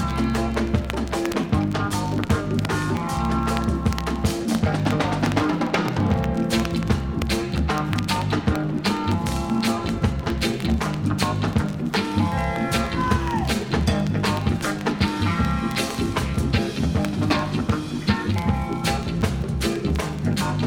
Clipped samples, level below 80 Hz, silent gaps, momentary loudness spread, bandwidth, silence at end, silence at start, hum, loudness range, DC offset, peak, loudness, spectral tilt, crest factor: under 0.1%; -32 dBFS; none; 2 LU; 19 kHz; 0 s; 0 s; none; 1 LU; under 0.1%; -4 dBFS; -23 LUFS; -6 dB/octave; 18 dB